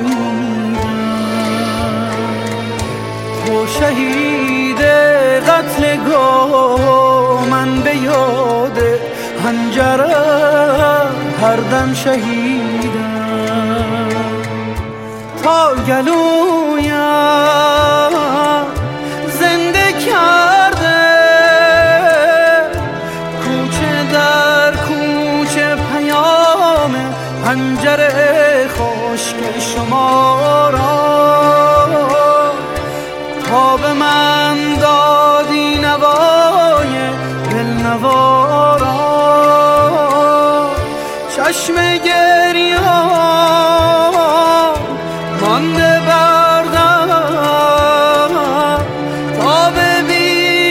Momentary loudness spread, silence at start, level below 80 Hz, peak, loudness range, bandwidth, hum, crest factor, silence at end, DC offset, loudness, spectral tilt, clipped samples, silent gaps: 9 LU; 0 s; -36 dBFS; 0 dBFS; 4 LU; 16.5 kHz; none; 12 dB; 0 s; under 0.1%; -12 LUFS; -4.5 dB/octave; under 0.1%; none